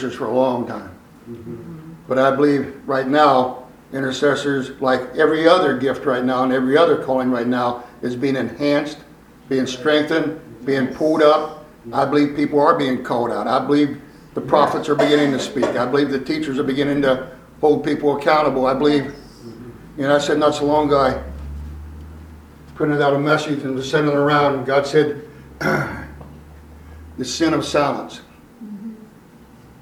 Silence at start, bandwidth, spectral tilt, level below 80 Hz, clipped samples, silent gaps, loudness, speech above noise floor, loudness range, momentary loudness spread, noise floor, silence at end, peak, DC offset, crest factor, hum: 0 s; 14.5 kHz; -5.5 dB/octave; -46 dBFS; under 0.1%; none; -18 LUFS; 27 dB; 4 LU; 19 LU; -45 dBFS; 0.8 s; 0 dBFS; under 0.1%; 18 dB; none